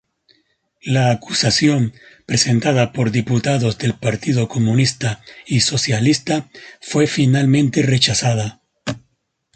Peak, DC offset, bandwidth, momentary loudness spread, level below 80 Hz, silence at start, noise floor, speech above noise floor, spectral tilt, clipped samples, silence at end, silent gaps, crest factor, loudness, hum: -2 dBFS; under 0.1%; 9.2 kHz; 14 LU; -50 dBFS; 0.85 s; -67 dBFS; 50 dB; -5 dB/octave; under 0.1%; 0.55 s; none; 16 dB; -17 LUFS; none